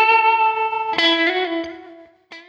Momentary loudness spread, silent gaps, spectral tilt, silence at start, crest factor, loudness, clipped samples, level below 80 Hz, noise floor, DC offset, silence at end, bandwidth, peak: 11 LU; none; -2.5 dB/octave; 0 s; 16 dB; -17 LUFS; under 0.1%; -66 dBFS; -43 dBFS; under 0.1%; 0.1 s; 7.6 kHz; -4 dBFS